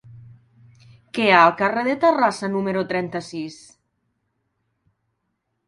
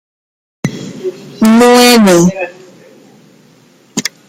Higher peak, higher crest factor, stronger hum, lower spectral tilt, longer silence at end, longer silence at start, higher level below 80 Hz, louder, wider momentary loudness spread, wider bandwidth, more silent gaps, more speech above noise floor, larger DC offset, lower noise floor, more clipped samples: about the same, 0 dBFS vs 0 dBFS; first, 22 dB vs 12 dB; neither; about the same, -5 dB/octave vs -4.5 dB/octave; first, 2.15 s vs 0.2 s; second, 0.1 s vs 0.65 s; second, -64 dBFS vs -50 dBFS; second, -19 LUFS vs -8 LUFS; about the same, 18 LU vs 18 LU; second, 11.5 kHz vs 16.5 kHz; neither; first, 55 dB vs 38 dB; neither; first, -75 dBFS vs -45 dBFS; neither